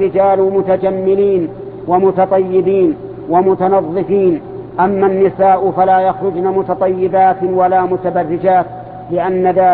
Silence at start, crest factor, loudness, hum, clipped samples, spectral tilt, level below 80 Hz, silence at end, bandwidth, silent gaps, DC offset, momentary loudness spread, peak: 0 s; 12 dB; -13 LUFS; none; under 0.1%; -12 dB/octave; -48 dBFS; 0 s; 4.2 kHz; none; under 0.1%; 6 LU; 0 dBFS